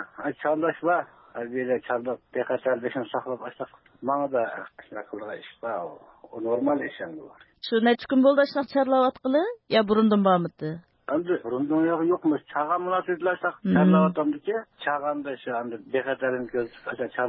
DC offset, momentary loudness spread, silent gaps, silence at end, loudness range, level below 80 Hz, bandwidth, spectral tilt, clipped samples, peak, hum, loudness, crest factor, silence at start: under 0.1%; 16 LU; none; 0 s; 8 LU; -66 dBFS; 5.8 kHz; -11 dB/octave; under 0.1%; -6 dBFS; none; -25 LUFS; 18 dB; 0 s